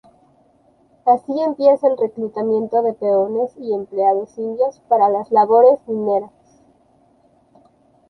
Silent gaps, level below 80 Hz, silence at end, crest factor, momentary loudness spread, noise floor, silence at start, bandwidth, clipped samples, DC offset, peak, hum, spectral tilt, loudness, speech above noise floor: none; -66 dBFS; 1.85 s; 16 dB; 9 LU; -56 dBFS; 1.05 s; 6.2 kHz; under 0.1%; under 0.1%; -2 dBFS; none; -8 dB/octave; -17 LUFS; 39 dB